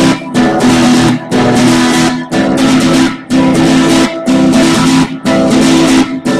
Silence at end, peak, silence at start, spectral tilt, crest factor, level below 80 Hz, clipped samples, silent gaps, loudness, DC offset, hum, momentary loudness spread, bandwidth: 0 s; 0 dBFS; 0 s; -4.5 dB/octave; 8 dB; -34 dBFS; under 0.1%; none; -9 LUFS; under 0.1%; none; 4 LU; 14.5 kHz